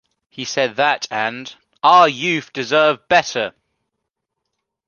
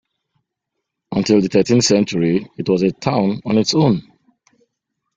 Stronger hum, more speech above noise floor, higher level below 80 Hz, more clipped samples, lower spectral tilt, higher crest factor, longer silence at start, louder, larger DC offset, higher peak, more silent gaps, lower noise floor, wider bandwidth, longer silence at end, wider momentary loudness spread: neither; about the same, 61 dB vs 63 dB; second, -64 dBFS vs -52 dBFS; neither; second, -3 dB/octave vs -5.5 dB/octave; about the same, 18 dB vs 16 dB; second, 0.4 s vs 1.1 s; about the same, -17 LUFS vs -17 LUFS; neither; about the same, 0 dBFS vs -2 dBFS; neither; about the same, -78 dBFS vs -78 dBFS; about the same, 7.2 kHz vs 7.8 kHz; first, 1.35 s vs 1.15 s; first, 14 LU vs 7 LU